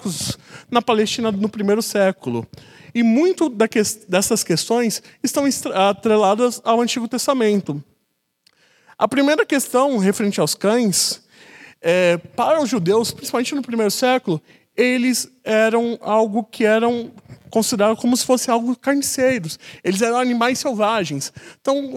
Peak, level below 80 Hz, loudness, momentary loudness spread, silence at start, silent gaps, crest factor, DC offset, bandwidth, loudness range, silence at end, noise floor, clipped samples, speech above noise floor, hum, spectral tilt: 0 dBFS; -62 dBFS; -19 LUFS; 9 LU; 0 s; none; 18 dB; under 0.1%; 16.5 kHz; 2 LU; 0 s; -70 dBFS; under 0.1%; 52 dB; none; -4 dB/octave